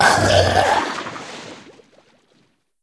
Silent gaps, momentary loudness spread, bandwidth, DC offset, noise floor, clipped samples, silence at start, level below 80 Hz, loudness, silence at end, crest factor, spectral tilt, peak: none; 21 LU; 11 kHz; under 0.1%; -62 dBFS; under 0.1%; 0 s; -44 dBFS; -16 LUFS; 1.25 s; 20 dB; -3.5 dB/octave; 0 dBFS